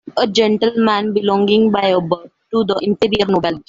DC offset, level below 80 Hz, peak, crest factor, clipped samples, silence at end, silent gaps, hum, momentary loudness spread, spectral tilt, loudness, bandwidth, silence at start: under 0.1%; -50 dBFS; -2 dBFS; 14 dB; under 0.1%; 0.1 s; none; none; 6 LU; -6 dB/octave; -16 LUFS; 7.6 kHz; 0.05 s